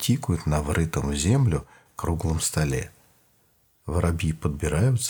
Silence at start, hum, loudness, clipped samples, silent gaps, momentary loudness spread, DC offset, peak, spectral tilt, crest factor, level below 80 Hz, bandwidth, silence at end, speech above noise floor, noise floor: 0 s; none; -25 LUFS; under 0.1%; none; 9 LU; under 0.1%; -8 dBFS; -5.5 dB/octave; 18 dB; -36 dBFS; over 20 kHz; 0 s; 40 dB; -64 dBFS